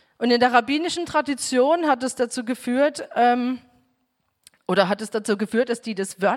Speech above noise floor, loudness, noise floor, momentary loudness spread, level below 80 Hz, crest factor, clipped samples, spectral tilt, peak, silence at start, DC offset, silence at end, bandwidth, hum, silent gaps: 51 dB; -22 LUFS; -72 dBFS; 8 LU; -66 dBFS; 18 dB; under 0.1%; -4 dB/octave; -4 dBFS; 0.2 s; under 0.1%; 0 s; 14.5 kHz; none; none